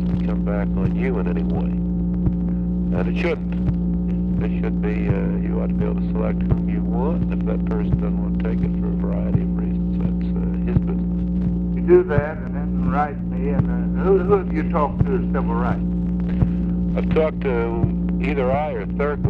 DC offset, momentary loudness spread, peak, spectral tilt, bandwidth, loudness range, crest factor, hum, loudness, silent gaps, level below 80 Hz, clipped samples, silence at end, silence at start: under 0.1%; 3 LU; -4 dBFS; -11 dB/octave; 4.1 kHz; 2 LU; 16 dB; 60 Hz at -35 dBFS; -21 LUFS; none; -28 dBFS; under 0.1%; 0 s; 0 s